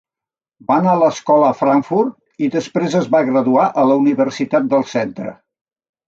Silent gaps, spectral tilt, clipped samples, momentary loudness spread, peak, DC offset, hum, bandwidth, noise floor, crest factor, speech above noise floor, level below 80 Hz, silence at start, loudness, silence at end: none; -7 dB/octave; under 0.1%; 9 LU; -2 dBFS; under 0.1%; none; 7.6 kHz; -89 dBFS; 14 dB; 74 dB; -64 dBFS; 0.7 s; -16 LUFS; 0.75 s